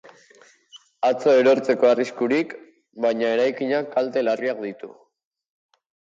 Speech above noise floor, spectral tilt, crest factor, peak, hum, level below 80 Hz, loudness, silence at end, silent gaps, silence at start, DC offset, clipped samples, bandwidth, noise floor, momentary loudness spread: 33 dB; -5.5 dB/octave; 16 dB; -6 dBFS; none; -74 dBFS; -21 LUFS; 1.25 s; none; 0.75 s; under 0.1%; under 0.1%; 7.8 kHz; -54 dBFS; 15 LU